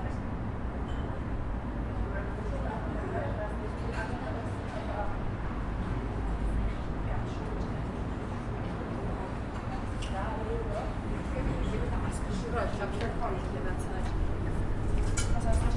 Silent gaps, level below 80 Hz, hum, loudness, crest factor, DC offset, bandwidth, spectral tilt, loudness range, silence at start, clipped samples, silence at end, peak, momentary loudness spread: none; -36 dBFS; none; -35 LUFS; 18 dB; under 0.1%; 11.5 kHz; -6.5 dB/octave; 2 LU; 0 s; under 0.1%; 0 s; -14 dBFS; 4 LU